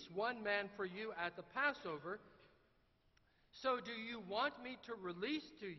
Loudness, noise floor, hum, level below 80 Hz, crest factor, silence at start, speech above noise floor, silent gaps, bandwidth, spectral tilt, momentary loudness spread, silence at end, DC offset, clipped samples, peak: -43 LUFS; -76 dBFS; none; -78 dBFS; 22 dB; 0 s; 32 dB; none; 6 kHz; -1.5 dB/octave; 10 LU; 0 s; under 0.1%; under 0.1%; -24 dBFS